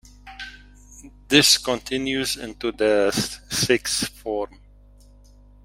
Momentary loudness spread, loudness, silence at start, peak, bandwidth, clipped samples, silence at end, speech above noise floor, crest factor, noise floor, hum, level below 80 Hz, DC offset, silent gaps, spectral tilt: 20 LU; -21 LUFS; 0.25 s; 0 dBFS; 16 kHz; under 0.1%; 1.2 s; 27 dB; 24 dB; -49 dBFS; 50 Hz at -45 dBFS; -48 dBFS; under 0.1%; none; -2.5 dB/octave